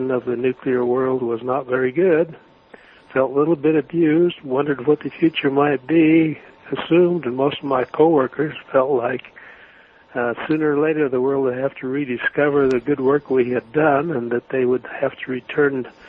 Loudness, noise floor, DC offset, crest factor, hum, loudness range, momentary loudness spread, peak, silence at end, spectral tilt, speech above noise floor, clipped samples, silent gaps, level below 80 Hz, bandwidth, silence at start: -19 LUFS; -48 dBFS; under 0.1%; 16 dB; none; 3 LU; 8 LU; -2 dBFS; 0.2 s; -9 dB/octave; 30 dB; under 0.1%; none; -60 dBFS; 5.2 kHz; 0 s